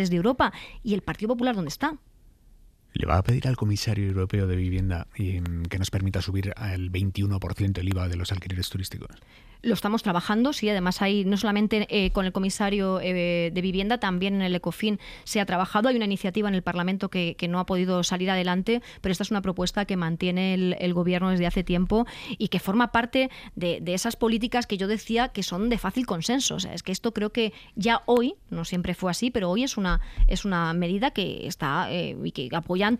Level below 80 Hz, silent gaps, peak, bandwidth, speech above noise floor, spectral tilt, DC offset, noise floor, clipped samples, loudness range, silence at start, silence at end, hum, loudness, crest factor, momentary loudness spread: -38 dBFS; none; -6 dBFS; 15.5 kHz; 29 dB; -5.5 dB/octave; under 0.1%; -54 dBFS; under 0.1%; 3 LU; 0 s; 0 s; none; -26 LUFS; 20 dB; 7 LU